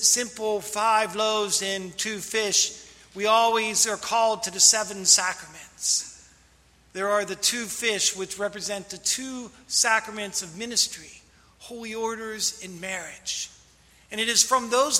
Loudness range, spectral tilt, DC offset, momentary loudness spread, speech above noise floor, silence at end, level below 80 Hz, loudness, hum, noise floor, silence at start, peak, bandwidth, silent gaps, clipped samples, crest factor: 8 LU; 0 dB/octave; under 0.1%; 17 LU; 33 dB; 0 s; -64 dBFS; -23 LUFS; none; -58 dBFS; 0 s; -2 dBFS; 16 kHz; none; under 0.1%; 24 dB